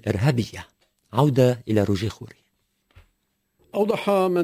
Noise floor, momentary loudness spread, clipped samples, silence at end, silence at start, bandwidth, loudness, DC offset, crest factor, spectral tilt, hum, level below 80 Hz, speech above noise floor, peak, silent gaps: -72 dBFS; 16 LU; under 0.1%; 0 s; 0.05 s; 16 kHz; -23 LUFS; under 0.1%; 18 dB; -7 dB/octave; none; -48 dBFS; 51 dB; -6 dBFS; none